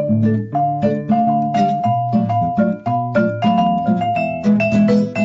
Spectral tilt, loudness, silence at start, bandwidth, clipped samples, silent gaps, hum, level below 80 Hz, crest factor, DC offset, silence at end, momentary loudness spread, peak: -8.5 dB/octave; -17 LUFS; 0 s; 7.4 kHz; under 0.1%; none; none; -48 dBFS; 10 dB; under 0.1%; 0 s; 4 LU; -6 dBFS